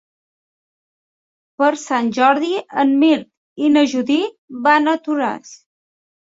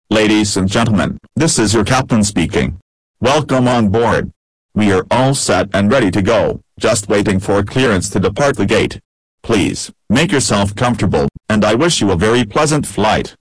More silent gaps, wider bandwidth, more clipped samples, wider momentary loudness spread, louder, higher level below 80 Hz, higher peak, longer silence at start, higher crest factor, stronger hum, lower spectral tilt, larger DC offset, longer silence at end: second, 3.37-3.56 s, 4.38-4.48 s vs 2.82-3.14 s, 4.36-4.69 s, 9.05-9.38 s; second, 8 kHz vs 11 kHz; neither; about the same, 7 LU vs 6 LU; second, -17 LUFS vs -14 LUFS; second, -68 dBFS vs -36 dBFS; first, -2 dBFS vs -8 dBFS; first, 1.6 s vs 0.1 s; first, 18 dB vs 6 dB; neither; about the same, -4 dB/octave vs -5 dB/octave; second, under 0.1% vs 0.6%; first, 0.75 s vs 0.1 s